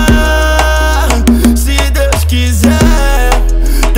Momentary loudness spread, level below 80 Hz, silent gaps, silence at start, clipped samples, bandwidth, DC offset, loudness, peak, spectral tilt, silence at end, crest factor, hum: 3 LU; -10 dBFS; none; 0 s; 0.5%; 16.5 kHz; under 0.1%; -10 LUFS; 0 dBFS; -5 dB/octave; 0 s; 8 dB; none